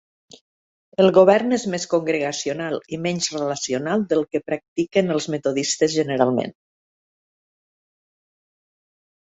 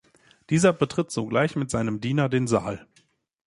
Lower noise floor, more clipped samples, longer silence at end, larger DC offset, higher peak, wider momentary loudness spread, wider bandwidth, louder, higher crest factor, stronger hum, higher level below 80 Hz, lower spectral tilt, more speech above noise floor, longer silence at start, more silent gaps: first, under -90 dBFS vs -64 dBFS; neither; first, 2.75 s vs 0.65 s; neither; first, -2 dBFS vs -6 dBFS; first, 10 LU vs 6 LU; second, 8.2 kHz vs 11.5 kHz; first, -21 LUFS vs -24 LUFS; about the same, 22 dB vs 20 dB; neither; second, -64 dBFS vs -54 dBFS; second, -4.5 dB/octave vs -6 dB/octave; first, over 70 dB vs 41 dB; first, 1 s vs 0.5 s; first, 4.68-4.76 s vs none